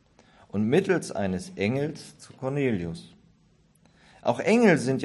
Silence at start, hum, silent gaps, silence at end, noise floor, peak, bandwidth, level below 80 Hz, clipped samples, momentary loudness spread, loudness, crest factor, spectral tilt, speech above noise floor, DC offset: 0.55 s; none; none; 0 s; -62 dBFS; -6 dBFS; 12 kHz; -56 dBFS; under 0.1%; 16 LU; -26 LUFS; 20 dB; -6.5 dB/octave; 37 dB; under 0.1%